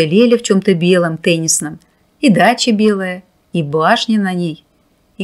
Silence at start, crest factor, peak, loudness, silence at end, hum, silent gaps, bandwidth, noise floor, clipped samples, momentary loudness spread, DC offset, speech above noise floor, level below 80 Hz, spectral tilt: 0 s; 14 dB; 0 dBFS; -13 LUFS; 0 s; none; none; 15.5 kHz; -56 dBFS; under 0.1%; 12 LU; under 0.1%; 43 dB; -58 dBFS; -4.5 dB/octave